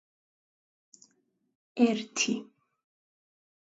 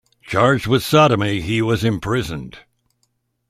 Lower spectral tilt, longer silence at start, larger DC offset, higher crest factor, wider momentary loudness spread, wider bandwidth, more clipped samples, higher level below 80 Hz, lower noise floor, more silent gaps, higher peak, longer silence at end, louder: second, -3 dB/octave vs -6 dB/octave; first, 1.75 s vs 0.25 s; neither; about the same, 22 dB vs 18 dB; about the same, 11 LU vs 13 LU; second, 8 kHz vs 15.5 kHz; neither; second, -84 dBFS vs -44 dBFS; first, -73 dBFS vs -68 dBFS; neither; second, -12 dBFS vs -2 dBFS; first, 1.2 s vs 0.9 s; second, -29 LUFS vs -17 LUFS